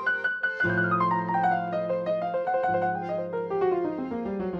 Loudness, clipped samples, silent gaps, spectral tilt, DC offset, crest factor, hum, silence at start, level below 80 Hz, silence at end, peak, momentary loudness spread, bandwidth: -27 LUFS; under 0.1%; none; -8.5 dB/octave; under 0.1%; 14 dB; none; 0 s; -62 dBFS; 0 s; -14 dBFS; 7 LU; 7.4 kHz